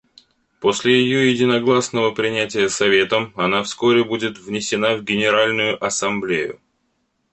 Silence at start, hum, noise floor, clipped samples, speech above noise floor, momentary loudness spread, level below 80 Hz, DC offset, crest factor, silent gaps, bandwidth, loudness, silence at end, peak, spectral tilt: 0.6 s; none; -68 dBFS; under 0.1%; 50 dB; 7 LU; -58 dBFS; under 0.1%; 16 dB; none; 8.8 kHz; -18 LUFS; 0.8 s; -2 dBFS; -3.5 dB/octave